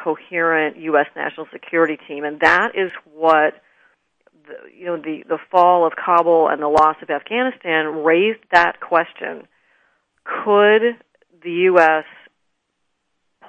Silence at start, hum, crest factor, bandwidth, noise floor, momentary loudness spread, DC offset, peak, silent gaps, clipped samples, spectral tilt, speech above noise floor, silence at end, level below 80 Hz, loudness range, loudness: 0 s; none; 18 dB; 8.8 kHz; -72 dBFS; 14 LU; under 0.1%; 0 dBFS; none; under 0.1%; -5.5 dB/octave; 55 dB; 1.45 s; -62 dBFS; 3 LU; -17 LUFS